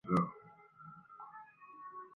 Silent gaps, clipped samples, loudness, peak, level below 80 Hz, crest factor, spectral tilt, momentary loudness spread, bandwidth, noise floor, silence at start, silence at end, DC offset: none; under 0.1%; -41 LUFS; -20 dBFS; -70 dBFS; 22 dB; -8 dB/octave; 22 LU; 6.6 kHz; -59 dBFS; 0.05 s; 0.1 s; under 0.1%